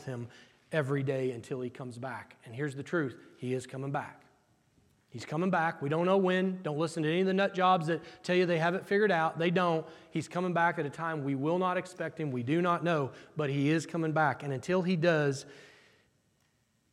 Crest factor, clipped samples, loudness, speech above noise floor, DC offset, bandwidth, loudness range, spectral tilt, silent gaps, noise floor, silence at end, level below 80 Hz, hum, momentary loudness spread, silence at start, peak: 18 dB; under 0.1%; -31 LUFS; 42 dB; under 0.1%; 12 kHz; 8 LU; -6.5 dB/octave; none; -73 dBFS; 1.25 s; -78 dBFS; none; 13 LU; 0 s; -14 dBFS